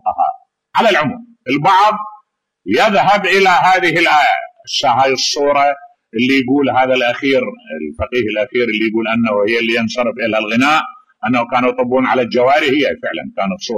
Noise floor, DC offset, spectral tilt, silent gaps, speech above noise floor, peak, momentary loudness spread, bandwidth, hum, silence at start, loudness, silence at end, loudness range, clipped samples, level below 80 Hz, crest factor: -51 dBFS; under 0.1%; -4 dB/octave; none; 37 dB; -2 dBFS; 11 LU; 15 kHz; none; 0.05 s; -14 LUFS; 0 s; 3 LU; under 0.1%; -50 dBFS; 12 dB